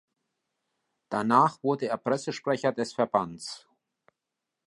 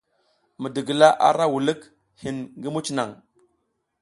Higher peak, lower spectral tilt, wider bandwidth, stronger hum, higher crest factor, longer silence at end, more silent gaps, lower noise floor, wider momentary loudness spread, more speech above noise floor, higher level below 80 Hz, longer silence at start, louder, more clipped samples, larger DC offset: second, -8 dBFS vs 0 dBFS; about the same, -5.5 dB/octave vs -4.5 dB/octave; about the same, 11.5 kHz vs 11.5 kHz; neither; about the same, 22 dB vs 22 dB; first, 1.1 s vs 0.85 s; neither; first, -86 dBFS vs -73 dBFS; about the same, 15 LU vs 17 LU; first, 59 dB vs 52 dB; second, -72 dBFS vs -66 dBFS; first, 1.1 s vs 0.6 s; second, -27 LUFS vs -22 LUFS; neither; neither